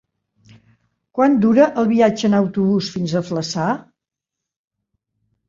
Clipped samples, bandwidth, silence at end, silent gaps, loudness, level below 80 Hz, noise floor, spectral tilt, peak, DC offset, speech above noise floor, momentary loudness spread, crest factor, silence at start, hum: under 0.1%; 7.6 kHz; 1.7 s; none; -17 LUFS; -60 dBFS; -84 dBFS; -6.5 dB/octave; -2 dBFS; under 0.1%; 67 dB; 9 LU; 18 dB; 1.15 s; none